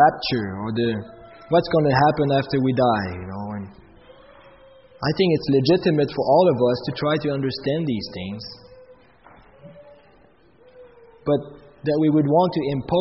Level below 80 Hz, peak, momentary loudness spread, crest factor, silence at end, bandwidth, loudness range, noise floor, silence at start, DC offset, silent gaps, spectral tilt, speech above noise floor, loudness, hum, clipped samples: -52 dBFS; -4 dBFS; 14 LU; 18 dB; 0 s; 6 kHz; 12 LU; -55 dBFS; 0 s; under 0.1%; none; -5.5 dB/octave; 34 dB; -21 LUFS; none; under 0.1%